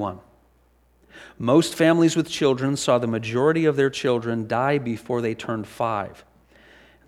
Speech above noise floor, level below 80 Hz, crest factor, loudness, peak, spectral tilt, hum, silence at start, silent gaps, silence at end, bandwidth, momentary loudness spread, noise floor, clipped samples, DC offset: 38 dB; -60 dBFS; 18 dB; -22 LUFS; -6 dBFS; -5.5 dB/octave; none; 0 s; none; 0.95 s; 14 kHz; 11 LU; -60 dBFS; under 0.1%; under 0.1%